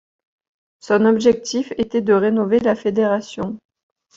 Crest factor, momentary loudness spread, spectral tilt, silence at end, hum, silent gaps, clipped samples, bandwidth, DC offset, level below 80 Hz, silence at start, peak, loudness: 16 dB; 13 LU; -5.5 dB/octave; 0.6 s; none; none; under 0.1%; 7.8 kHz; under 0.1%; -56 dBFS; 0.85 s; -2 dBFS; -18 LUFS